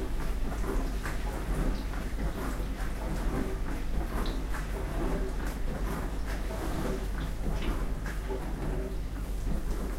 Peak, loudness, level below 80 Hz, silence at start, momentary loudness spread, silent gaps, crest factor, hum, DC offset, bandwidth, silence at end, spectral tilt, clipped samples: -18 dBFS; -35 LUFS; -32 dBFS; 0 s; 3 LU; none; 14 dB; none; under 0.1%; 16 kHz; 0 s; -6 dB/octave; under 0.1%